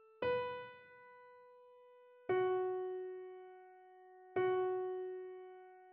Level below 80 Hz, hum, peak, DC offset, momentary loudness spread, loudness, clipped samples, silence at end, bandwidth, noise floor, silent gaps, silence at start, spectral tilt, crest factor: -82 dBFS; none; -24 dBFS; under 0.1%; 25 LU; -40 LUFS; under 0.1%; 0 s; 4.8 kHz; -63 dBFS; none; 0.2 s; -4 dB/octave; 16 dB